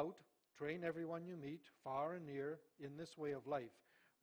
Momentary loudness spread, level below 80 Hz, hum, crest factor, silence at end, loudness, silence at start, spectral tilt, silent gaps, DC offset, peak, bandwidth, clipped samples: 9 LU; -84 dBFS; none; 18 dB; 0.5 s; -48 LUFS; 0 s; -7 dB/octave; none; under 0.1%; -30 dBFS; over 20 kHz; under 0.1%